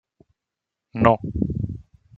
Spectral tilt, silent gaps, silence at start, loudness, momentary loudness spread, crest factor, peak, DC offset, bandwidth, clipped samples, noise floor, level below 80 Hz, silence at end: -9.5 dB/octave; none; 0.95 s; -22 LUFS; 17 LU; 24 dB; -2 dBFS; under 0.1%; 7.4 kHz; under 0.1%; -85 dBFS; -42 dBFS; 0.35 s